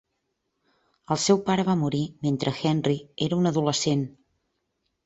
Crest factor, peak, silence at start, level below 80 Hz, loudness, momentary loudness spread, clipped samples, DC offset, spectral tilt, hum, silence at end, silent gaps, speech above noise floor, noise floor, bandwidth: 18 dB; -8 dBFS; 1.1 s; -62 dBFS; -25 LUFS; 6 LU; under 0.1%; under 0.1%; -5.5 dB/octave; none; 0.95 s; none; 53 dB; -78 dBFS; 8.2 kHz